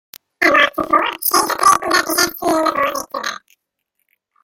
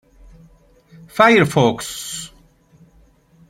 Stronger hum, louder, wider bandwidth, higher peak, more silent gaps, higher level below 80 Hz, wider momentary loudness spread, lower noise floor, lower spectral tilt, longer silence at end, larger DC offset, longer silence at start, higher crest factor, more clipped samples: neither; about the same, -15 LUFS vs -16 LUFS; about the same, 17 kHz vs 16.5 kHz; about the same, 0 dBFS vs -2 dBFS; neither; about the same, -54 dBFS vs -50 dBFS; second, 12 LU vs 18 LU; first, -73 dBFS vs -53 dBFS; second, -1 dB/octave vs -5 dB/octave; second, 1.1 s vs 1.25 s; neither; second, 0.4 s vs 1.15 s; about the same, 18 dB vs 20 dB; neither